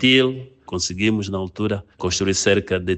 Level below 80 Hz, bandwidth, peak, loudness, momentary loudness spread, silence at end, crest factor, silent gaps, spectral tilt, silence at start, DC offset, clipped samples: -48 dBFS; 8.8 kHz; -2 dBFS; -21 LUFS; 9 LU; 0 s; 18 dB; none; -4 dB/octave; 0 s; under 0.1%; under 0.1%